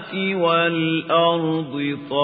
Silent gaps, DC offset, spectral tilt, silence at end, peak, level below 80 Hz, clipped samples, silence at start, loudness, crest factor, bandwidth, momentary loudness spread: none; under 0.1%; -10.5 dB/octave; 0 s; -6 dBFS; -68 dBFS; under 0.1%; 0 s; -20 LUFS; 16 dB; 4.9 kHz; 6 LU